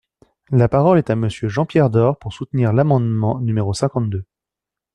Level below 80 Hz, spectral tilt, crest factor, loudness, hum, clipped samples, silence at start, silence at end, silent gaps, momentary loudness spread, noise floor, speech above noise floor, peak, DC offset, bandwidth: -48 dBFS; -8 dB/octave; 16 dB; -18 LUFS; none; under 0.1%; 0.5 s; 0.7 s; none; 8 LU; -86 dBFS; 70 dB; -2 dBFS; under 0.1%; 10.5 kHz